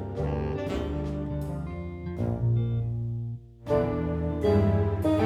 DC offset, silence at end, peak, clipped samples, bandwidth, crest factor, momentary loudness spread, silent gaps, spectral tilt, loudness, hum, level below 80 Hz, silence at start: under 0.1%; 0 s; -12 dBFS; under 0.1%; 11.5 kHz; 16 dB; 11 LU; none; -9 dB/octave; -29 LUFS; none; -40 dBFS; 0 s